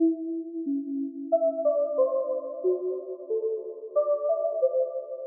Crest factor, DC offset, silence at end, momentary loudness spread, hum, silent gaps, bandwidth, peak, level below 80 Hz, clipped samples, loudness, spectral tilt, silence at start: 14 dB; under 0.1%; 0 s; 8 LU; none; none; 1.4 kHz; -14 dBFS; under -90 dBFS; under 0.1%; -28 LUFS; 8.5 dB/octave; 0 s